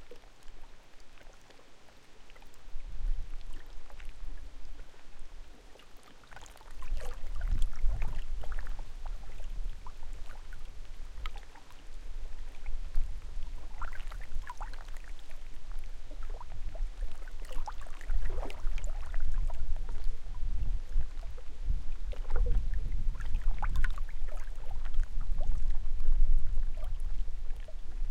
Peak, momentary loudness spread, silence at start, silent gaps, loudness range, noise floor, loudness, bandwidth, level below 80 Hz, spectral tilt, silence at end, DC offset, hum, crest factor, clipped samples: -12 dBFS; 19 LU; 0 s; none; 11 LU; -50 dBFS; -42 LUFS; 4.2 kHz; -32 dBFS; -5.5 dB/octave; 0 s; under 0.1%; none; 16 dB; under 0.1%